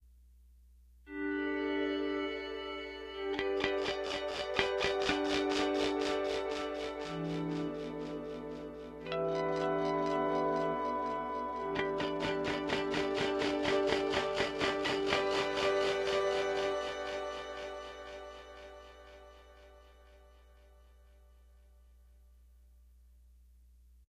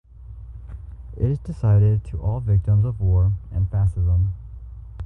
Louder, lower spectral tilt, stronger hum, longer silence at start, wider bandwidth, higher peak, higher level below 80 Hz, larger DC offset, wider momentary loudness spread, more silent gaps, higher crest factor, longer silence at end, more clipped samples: second, -34 LUFS vs -21 LUFS; second, -4.5 dB/octave vs -11 dB/octave; neither; first, 1.05 s vs 0.15 s; first, 12 kHz vs 2.8 kHz; about the same, -8 dBFS vs -8 dBFS; second, -58 dBFS vs -30 dBFS; neither; second, 13 LU vs 21 LU; neither; first, 28 dB vs 12 dB; first, 3.25 s vs 0 s; neither